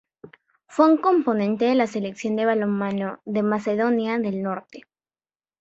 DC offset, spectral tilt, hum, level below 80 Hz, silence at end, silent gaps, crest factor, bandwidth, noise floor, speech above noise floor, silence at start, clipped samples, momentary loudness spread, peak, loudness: under 0.1%; -7 dB/octave; none; -70 dBFS; 0.8 s; none; 20 dB; 8 kHz; under -90 dBFS; over 68 dB; 0.25 s; under 0.1%; 10 LU; -4 dBFS; -22 LUFS